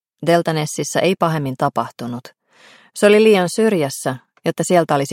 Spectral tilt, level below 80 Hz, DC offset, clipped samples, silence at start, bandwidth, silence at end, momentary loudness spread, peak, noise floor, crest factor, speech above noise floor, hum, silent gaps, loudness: -5 dB/octave; -64 dBFS; under 0.1%; under 0.1%; 0.2 s; 16.5 kHz; 0 s; 14 LU; -2 dBFS; -49 dBFS; 16 dB; 32 dB; none; none; -17 LUFS